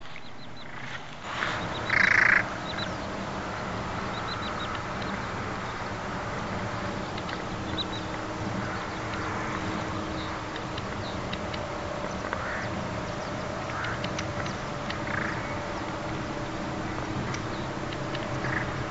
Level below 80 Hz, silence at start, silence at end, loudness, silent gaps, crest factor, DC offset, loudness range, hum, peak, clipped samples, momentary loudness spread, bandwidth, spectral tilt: -46 dBFS; 0 s; 0 s; -30 LUFS; none; 22 dB; under 0.1%; 7 LU; none; -10 dBFS; under 0.1%; 4 LU; 8 kHz; -3.5 dB/octave